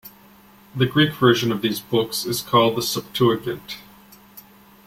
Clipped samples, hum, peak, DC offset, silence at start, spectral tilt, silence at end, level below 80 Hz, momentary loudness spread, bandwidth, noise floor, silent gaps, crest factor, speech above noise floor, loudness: under 0.1%; none; -2 dBFS; under 0.1%; 0.05 s; -5 dB/octave; 0.45 s; -56 dBFS; 15 LU; 16.5 kHz; -50 dBFS; none; 20 dB; 29 dB; -20 LUFS